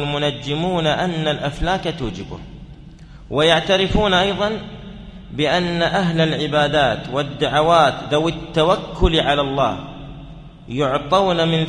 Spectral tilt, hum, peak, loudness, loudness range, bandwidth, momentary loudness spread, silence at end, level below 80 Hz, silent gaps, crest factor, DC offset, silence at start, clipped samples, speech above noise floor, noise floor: -5.5 dB/octave; none; 0 dBFS; -18 LUFS; 3 LU; 10.5 kHz; 17 LU; 0 s; -34 dBFS; none; 18 dB; under 0.1%; 0 s; under 0.1%; 21 dB; -39 dBFS